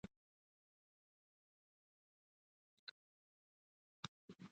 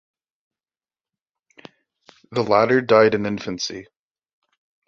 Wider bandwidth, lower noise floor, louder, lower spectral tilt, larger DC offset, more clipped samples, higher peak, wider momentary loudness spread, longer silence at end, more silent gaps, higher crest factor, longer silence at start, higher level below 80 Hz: about the same, 8.2 kHz vs 7.6 kHz; about the same, under -90 dBFS vs under -90 dBFS; second, -58 LUFS vs -19 LUFS; about the same, -4 dB/octave vs -5 dB/octave; neither; neither; second, -30 dBFS vs -2 dBFS; second, 5 LU vs 13 LU; second, 0 s vs 1.05 s; first, 0.16-4.28 s vs none; first, 34 dB vs 22 dB; second, 0.05 s vs 2.3 s; second, -84 dBFS vs -62 dBFS